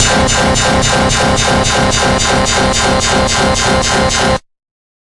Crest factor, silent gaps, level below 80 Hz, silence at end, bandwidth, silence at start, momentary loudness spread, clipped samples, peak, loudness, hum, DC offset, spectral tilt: 12 dB; none; -24 dBFS; 0.65 s; 12 kHz; 0 s; 1 LU; under 0.1%; 0 dBFS; -11 LUFS; none; under 0.1%; -3 dB/octave